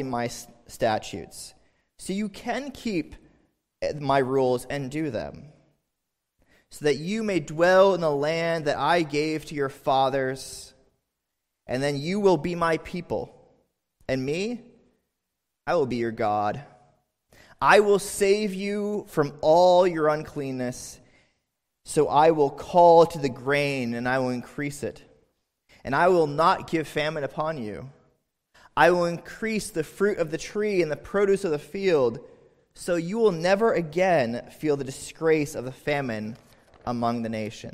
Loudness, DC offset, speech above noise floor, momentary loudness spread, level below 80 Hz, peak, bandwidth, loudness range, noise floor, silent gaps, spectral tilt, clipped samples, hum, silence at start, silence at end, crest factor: -24 LUFS; under 0.1%; 58 dB; 15 LU; -56 dBFS; -4 dBFS; 15.5 kHz; 7 LU; -82 dBFS; none; -5.5 dB/octave; under 0.1%; none; 0 s; 0.05 s; 22 dB